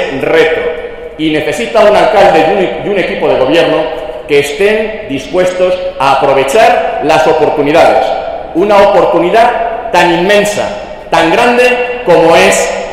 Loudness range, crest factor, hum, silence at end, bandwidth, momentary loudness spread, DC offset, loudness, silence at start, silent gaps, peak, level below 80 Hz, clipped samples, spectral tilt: 3 LU; 8 dB; none; 0 s; 16 kHz; 9 LU; 0.4%; -8 LUFS; 0 s; none; 0 dBFS; -36 dBFS; 1%; -4 dB/octave